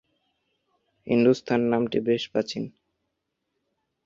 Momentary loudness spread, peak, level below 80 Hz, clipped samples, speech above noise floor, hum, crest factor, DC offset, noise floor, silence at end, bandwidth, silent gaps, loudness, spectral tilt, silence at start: 11 LU; -8 dBFS; -66 dBFS; under 0.1%; 56 dB; none; 20 dB; under 0.1%; -80 dBFS; 1.35 s; 7.6 kHz; none; -24 LUFS; -6.5 dB/octave; 1.05 s